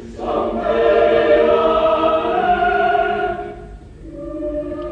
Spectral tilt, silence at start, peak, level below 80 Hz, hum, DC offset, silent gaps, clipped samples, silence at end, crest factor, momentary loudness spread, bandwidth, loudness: -6.5 dB/octave; 0 s; -2 dBFS; -38 dBFS; 50 Hz at -45 dBFS; under 0.1%; none; under 0.1%; 0 s; 14 dB; 16 LU; 7.8 kHz; -16 LUFS